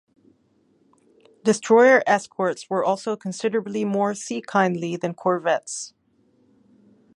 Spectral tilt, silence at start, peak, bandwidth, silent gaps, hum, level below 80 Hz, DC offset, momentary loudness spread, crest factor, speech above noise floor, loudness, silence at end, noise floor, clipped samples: -5 dB/octave; 1.45 s; -4 dBFS; 11 kHz; none; none; -74 dBFS; under 0.1%; 13 LU; 20 dB; 42 dB; -22 LUFS; 1.3 s; -63 dBFS; under 0.1%